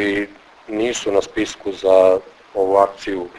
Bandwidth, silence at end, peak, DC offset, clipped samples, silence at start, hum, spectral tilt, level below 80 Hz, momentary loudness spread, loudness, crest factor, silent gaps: 11 kHz; 0 s; 0 dBFS; under 0.1%; under 0.1%; 0 s; none; -4 dB/octave; -52 dBFS; 13 LU; -18 LUFS; 18 dB; none